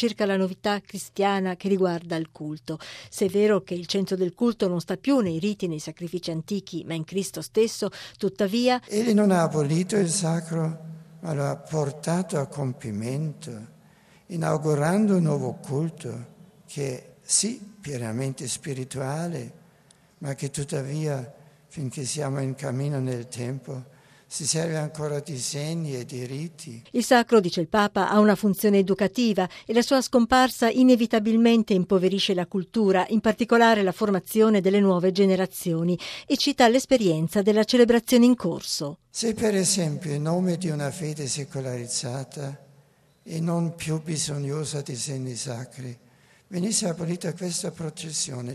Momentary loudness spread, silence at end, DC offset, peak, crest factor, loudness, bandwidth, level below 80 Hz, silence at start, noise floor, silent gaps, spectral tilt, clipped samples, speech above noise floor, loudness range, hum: 14 LU; 0 s; under 0.1%; -6 dBFS; 18 dB; -24 LUFS; 14.5 kHz; -60 dBFS; 0 s; -59 dBFS; none; -5 dB/octave; under 0.1%; 35 dB; 9 LU; none